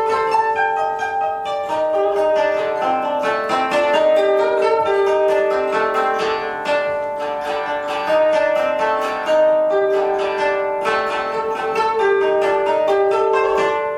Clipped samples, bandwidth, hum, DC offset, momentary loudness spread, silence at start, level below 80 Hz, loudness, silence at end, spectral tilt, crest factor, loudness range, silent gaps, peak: under 0.1%; 13 kHz; none; under 0.1%; 6 LU; 0 s; -56 dBFS; -18 LUFS; 0 s; -4 dB/octave; 14 dB; 2 LU; none; -4 dBFS